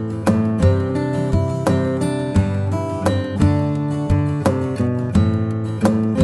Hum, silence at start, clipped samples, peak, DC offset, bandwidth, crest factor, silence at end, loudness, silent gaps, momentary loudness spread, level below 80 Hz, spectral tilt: none; 0 s; under 0.1%; -2 dBFS; under 0.1%; 11.5 kHz; 16 dB; 0 s; -19 LUFS; none; 4 LU; -34 dBFS; -8 dB/octave